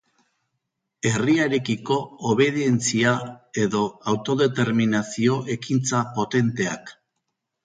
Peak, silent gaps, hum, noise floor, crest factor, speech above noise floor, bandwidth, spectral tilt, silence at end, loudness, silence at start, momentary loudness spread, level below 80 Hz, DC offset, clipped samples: -4 dBFS; none; none; -79 dBFS; 18 dB; 57 dB; 9.6 kHz; -5 dB/octave; 0.75 s; -23 LUFS; 1.05 s; 7 LU; -62 dBFS; under 0.1%; under 0.1%